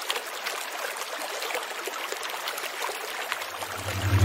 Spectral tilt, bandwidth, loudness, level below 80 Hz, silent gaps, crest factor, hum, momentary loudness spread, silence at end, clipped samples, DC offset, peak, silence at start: -3 dB/octave; 16 kHz; -31 LUFS; -56 dBFS; none; 24 dB; none; 2 LU; 0 s; under 0.1%; under 0.1%; -6 dBFS; 0 s